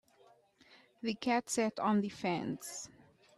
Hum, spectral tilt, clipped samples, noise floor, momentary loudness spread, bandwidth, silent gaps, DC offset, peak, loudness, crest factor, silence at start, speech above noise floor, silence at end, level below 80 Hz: none; -4.5 dB/octave; under 0.1%; -66 dBFS; 12 LU; 14 kHz; none; under 0.1%; -20 dBFS; -35 LUFS; 16 dB; 1.05 s; 31 dB; 0.45 s; -76 dBFS